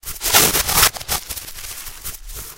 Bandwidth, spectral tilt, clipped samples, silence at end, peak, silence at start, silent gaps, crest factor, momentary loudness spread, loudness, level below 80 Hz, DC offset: 16.5 kHz; -0.5 dB/octave; under 0.1%; 0 s; 0 dBFS; 0.05 s; none; 20 dB; 18 LU; -15 LUFS; -36 dBFS; under 0.1%